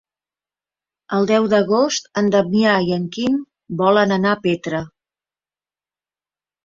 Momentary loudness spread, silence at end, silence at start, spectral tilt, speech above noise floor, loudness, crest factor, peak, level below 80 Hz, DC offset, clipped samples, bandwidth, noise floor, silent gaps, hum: 9 LU; 1.8 s; 1.1 s; -5.5 dB/octave; over 73 dB; -18 LUFS; 18 dB; -2 dBFS; -58 dBFS; under 0.1%; under 0.1%; 7.6 kHz; under -90 dBFS; none; 50 Hz at -50 dBFS